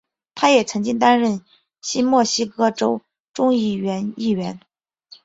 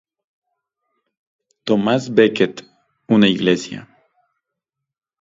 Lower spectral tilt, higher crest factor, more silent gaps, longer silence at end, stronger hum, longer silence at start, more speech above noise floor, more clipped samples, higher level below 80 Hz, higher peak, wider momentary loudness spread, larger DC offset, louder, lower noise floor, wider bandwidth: second, -4 dB/octave vs -6 dB/octave; about the same, 18 dB vs 20 dB; first, 3.20-3.24 s vs none; second, 0.65 s vs 1.4 s; neither; second, 0.35 s vs 1.65 s; second, 31 dB vs 65 dB; neither; about the same, -62 dBFS vs -60 dBFS; about the same, -2 dBFS vs 0 dBFS; second, 14 LU vs 17 LU; neither; about the same, -19 LUFS vs -17 LUFS; second, -50 dBFS vs -81 dBFS; about the same, 8 kHz vs 7.8 kHz